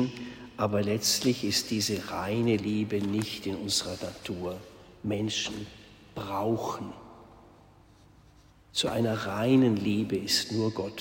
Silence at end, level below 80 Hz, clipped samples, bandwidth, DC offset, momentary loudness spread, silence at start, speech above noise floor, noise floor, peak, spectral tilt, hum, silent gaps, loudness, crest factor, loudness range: 0 s; -60 dBFS; under 0.1%; 16.5 kHz; under 0.1%; 14 LU; 0 s; 28 dB; -57 dBFS; -12 dBFS; -4.5 dB/octave; none; none; -29 LUFS; 18 dB; 7 LU